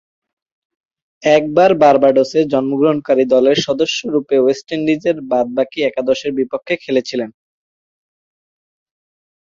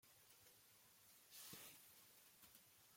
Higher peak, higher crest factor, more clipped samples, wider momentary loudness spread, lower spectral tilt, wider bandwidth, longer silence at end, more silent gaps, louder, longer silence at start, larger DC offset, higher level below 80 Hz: first, -2 dBFS vs -42 dBFS; second, 16 dB vs 24 dB; neither; about the same, 9 LU vs 11 LU; first, -5 dB/octave vs -1 dB/octave; second, 7.6 kHz vs 16.5 kHz; first, 2.15 s vs 0 s; neither; first, -15 LUFS vs -63 LUFS; first, 1.25 s vs 0 s; neither; first, -58 dBFS vs under -90 dBFS